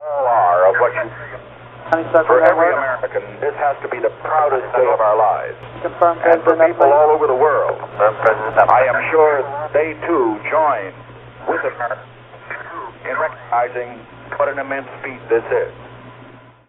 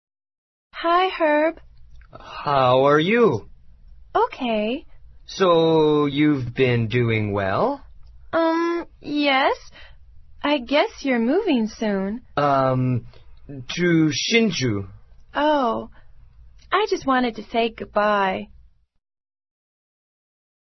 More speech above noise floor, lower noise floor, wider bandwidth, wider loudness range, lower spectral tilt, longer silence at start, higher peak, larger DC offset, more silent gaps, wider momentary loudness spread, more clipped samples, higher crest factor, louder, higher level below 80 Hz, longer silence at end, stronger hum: about the same, 26 dB vs 26 dB; second, -42 dBFS vs -46 dBFS; second, 4.1 kHz vs 6.2 kHz; first, 9 LU vs 4 LU; second, -4.5 dB/octave vs -6 dB/octave; second, 0 s vs 0.75 s; about the same, 0 dBFS vs -2 dBFS; neither; neither; first, 17 LU vs 13 LU; neither; about the same, 16 dB vs 20 dB; first, -16 LUFS vs -21 LUFS; about the same, -54 dBFS vs -50 dBFS; second, 0.4 s vs 2.3 s; neither